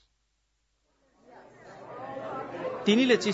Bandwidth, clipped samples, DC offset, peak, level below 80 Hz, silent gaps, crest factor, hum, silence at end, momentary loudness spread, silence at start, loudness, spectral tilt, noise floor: 8 kHz; under 0.1%; under 0.1%; -10 dBFS; -72 dBFS; none; 20 dB; none; 0 s; 24 LU; 1.3 s; -27 LUFS; -4.5 dB/octave; -75 dBFS